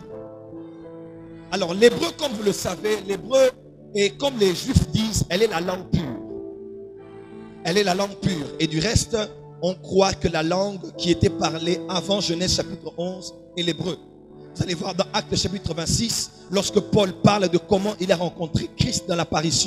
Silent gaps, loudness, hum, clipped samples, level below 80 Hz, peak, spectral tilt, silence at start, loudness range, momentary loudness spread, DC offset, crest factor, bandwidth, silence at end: none; -23 LUFS; 50 Hz at -50 dBFS; under 0.1%; -42 dBFS; -2 dBFS; -4.5 dB/octave; 0 s; 4 LU; 19 LU; under 0.1%; 22 dB; 15.5 kHz; 0 s